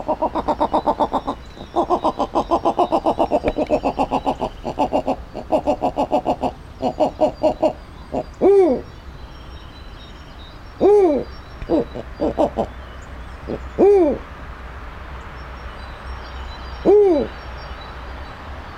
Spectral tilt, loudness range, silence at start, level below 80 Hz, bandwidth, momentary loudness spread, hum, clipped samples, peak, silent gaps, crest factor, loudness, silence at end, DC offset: -7 dB/octave; 2 LU; 0 s; -36 dBFS; 10.5 kHz; 22 LU; none; under 0.1%; -2 dBFS; none; 18 dB; -19 LUFS; 0 s; under 0.1%